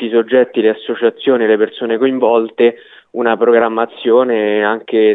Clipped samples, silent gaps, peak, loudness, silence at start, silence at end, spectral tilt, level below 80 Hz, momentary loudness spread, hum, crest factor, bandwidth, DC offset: under 0.1%; none; 0 dBFS; -14 LUFS; 0 s; 0 s; -8 dB/octave; -66 dBFS; 5 LU; none; 12 dB; 4 kHz; under 0.1%